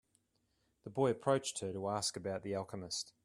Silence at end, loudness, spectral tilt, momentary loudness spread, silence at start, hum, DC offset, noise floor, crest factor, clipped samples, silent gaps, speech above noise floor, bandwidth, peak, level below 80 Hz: 0.15 s; -38 LUFS; -4 dB/octave; 8 LU; 0.85 s; none; under 0.1%; -79 dBFS; 22 dB; under 0.1%; none; 42 dB; 13 kHz; -18 dBFS; -76 dBFS